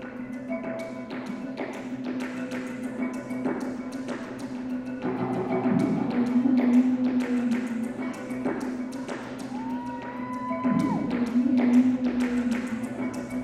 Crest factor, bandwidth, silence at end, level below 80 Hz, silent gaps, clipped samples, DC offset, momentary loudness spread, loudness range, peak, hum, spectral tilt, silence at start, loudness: 16 dB; 10.5 kHz; 0 s; -60 dBFS; none; under 0.1%; under 0.1%; 13 LU; 8 LU; -10 dBFS; none; -7 dB/octave; 0 s; -28 LUFS